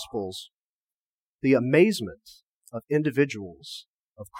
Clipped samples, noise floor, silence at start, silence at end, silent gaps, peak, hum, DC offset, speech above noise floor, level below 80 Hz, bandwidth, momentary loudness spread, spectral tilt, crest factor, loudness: under 0.1%; under -90 dBFS; 0 s; 0 s; 0.53-1.39 s, 2.43-2.61 s, 3.86-4.16 s; -6 dBFS; none; under 0.1%; over 65 dB; -66 dBFS; 16.5 kHz; 20 LU; -6 dB/octave; 20 dB; -24 LUFS